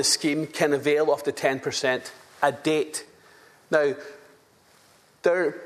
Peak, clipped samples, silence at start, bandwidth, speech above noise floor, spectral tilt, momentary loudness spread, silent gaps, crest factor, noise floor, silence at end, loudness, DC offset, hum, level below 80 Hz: -6 dBFS; under 0.1%; 0 s; 14 kHz; 34 dB; -3 dB/octave; 10 LU; none; 20 dB; -58 dBFS; 0 s; -25 LUFS; under 0.1%; none; -74 dBFS